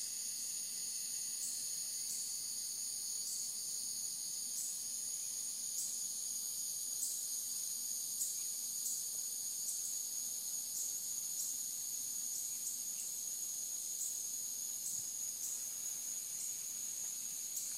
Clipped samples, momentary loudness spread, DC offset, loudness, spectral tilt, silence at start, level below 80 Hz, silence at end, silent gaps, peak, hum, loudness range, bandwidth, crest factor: under 0.1%; 2 LU; under 0.1%; -39 LUFS; 2 dB/octave; 0 s; -86 dBFS; 0 s; none; -26 dBFS; none; 1 LU; 16 kHz; 16 dB